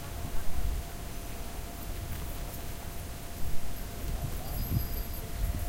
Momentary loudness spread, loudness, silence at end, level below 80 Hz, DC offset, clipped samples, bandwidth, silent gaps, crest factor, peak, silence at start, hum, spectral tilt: 7 LU; -38 LUFS; 0 s; -36 dBFS; under 0.1%; under 0.1%; 16 kHz; none; 16 dB; -16 dBFS; 0 s; none; -5 dB/octave